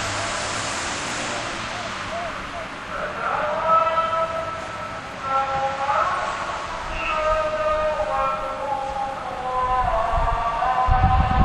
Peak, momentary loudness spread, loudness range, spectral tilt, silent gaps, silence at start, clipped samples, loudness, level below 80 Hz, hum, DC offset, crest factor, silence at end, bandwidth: -4 dBFS; 10 LU; 2 LU; -4 dB/octave; none; 0 s; under 0.1%; -23 LUFS; -32 dBFS; none; under 0.1%; 18 dB; 0 s; 12 kHz